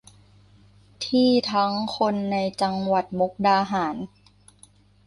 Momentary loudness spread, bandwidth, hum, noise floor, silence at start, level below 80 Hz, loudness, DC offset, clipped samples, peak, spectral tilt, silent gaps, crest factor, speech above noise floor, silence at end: 9 LU; 11.5 kHz; 50 Hz at -45 dBFS; -55 dBFS; 1 s; -60 dBFS; -23 LUFS; under 0.1%; under 0.1%; -8 dBFS; -5.5 dB/octave; none; 16 dB; 32 dB; 1 s